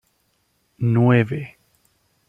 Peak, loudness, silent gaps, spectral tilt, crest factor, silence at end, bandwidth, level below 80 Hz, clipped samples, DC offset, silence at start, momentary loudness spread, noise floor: -4 dBFS; -19 LUFS; none; -9.5 dB/octave; 18 dB; 0.8 s; 3.6 kHz; -58 dBFS; under 0.1%; under 0.1%; 0.8 s; 15 LU; -67 dBFS